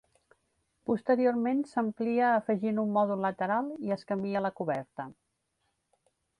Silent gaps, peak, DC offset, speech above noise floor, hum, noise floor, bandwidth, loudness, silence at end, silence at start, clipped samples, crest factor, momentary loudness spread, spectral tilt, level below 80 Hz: none; -16 dBFS; under 0.1%; 49 dB; none; -78 dBFS; 10.5 kHz; -30 LUFS; 1.25 s; 0.9 s; under 0.1%; 16 dB; 9 LU; -8 dB/octave; -74 dBFS